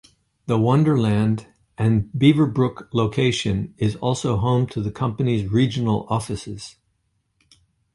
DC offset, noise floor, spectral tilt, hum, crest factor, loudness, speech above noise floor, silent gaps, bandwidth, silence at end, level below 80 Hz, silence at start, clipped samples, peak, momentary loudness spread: under 0.1%; -70 dBFS; -7 dB/octave; none; 18 dB; -21 LUFS; 50 dB; none; 11.5 kHz; 1.25 s; -46 dBFS; 0.45 s; under 0.1%; -2 dBFS; 10 LU